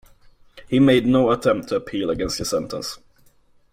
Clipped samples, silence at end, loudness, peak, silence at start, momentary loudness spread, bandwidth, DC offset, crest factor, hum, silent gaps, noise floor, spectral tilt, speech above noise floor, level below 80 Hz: under 0.1%; 0.75 s; -20 LUFS; -4 dBFS; 0.55 s; 14 LU; 16 kHz; under 0.1%; 16 dB; none; none; -56 dBFS; -5.5 dB/octave; 36 dB; -46 dBFS